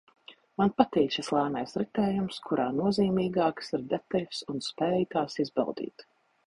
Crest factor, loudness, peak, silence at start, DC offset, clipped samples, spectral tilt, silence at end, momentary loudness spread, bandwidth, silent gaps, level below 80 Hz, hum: 24 dB; -29 LUFS; -6 dBFS; 0.3 s; under 0.1%; under 0.1%; -6.5 dB/octave; 0.45 s; 9 LU; 11.5 kHz; none; -62 dBFS; none